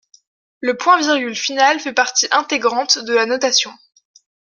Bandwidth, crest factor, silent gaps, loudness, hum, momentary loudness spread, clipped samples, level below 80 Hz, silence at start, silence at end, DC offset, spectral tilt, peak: 11 kHz; 18 dB; none; -16 LUFS; none; 6 LU; under 0.1%; -72 dBFS; 0.6 s; 0.8 s; under 0.1%; 0 dB/octave; 0 dBFS